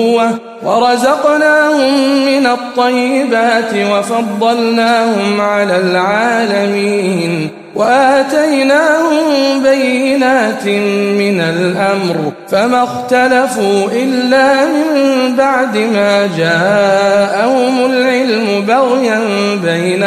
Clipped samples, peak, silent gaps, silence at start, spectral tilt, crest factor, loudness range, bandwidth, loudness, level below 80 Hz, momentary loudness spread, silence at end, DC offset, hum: under 0.1%; 0 dBFS; none; 0 s; -5 dB/octave; 10 dB; 2 LU; 15.5 kHz; -11 LUFS; -58 dBFS; 4 LU; 0 s; under 0.1%; none